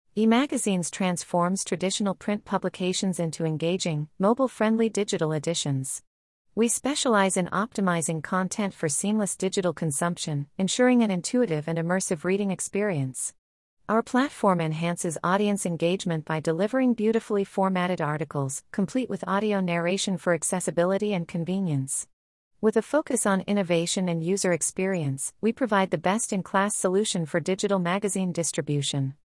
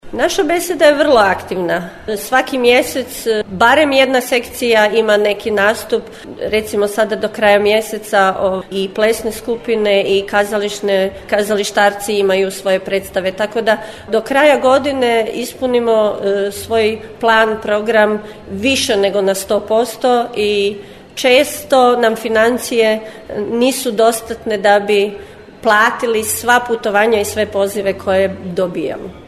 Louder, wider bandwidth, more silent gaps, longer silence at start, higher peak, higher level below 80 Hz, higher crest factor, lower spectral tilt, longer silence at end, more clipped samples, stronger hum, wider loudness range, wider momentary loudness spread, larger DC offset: second, -26 LUFS vs -14 LUFS; second, 12 kHz vs 14 kHz; first, 6.07-6.45 s, 13.38-13.77 s, 22.13-22.51 s vs none; about the same, 0.15 s vs 0.05 s; second, -8 dBFS vs 0 dBFS; second, -66 dBFS vs -46 dBFS; about the same, 18 dB vs 14 dB; about the same, -4.5 dB/octave vs -3.5 dB/octave; about the same, 0.1 s vs 0.05 s; neither; neither; about the same, 2 LU vs 2 LU; second, 5 LU vs 9 LU; neither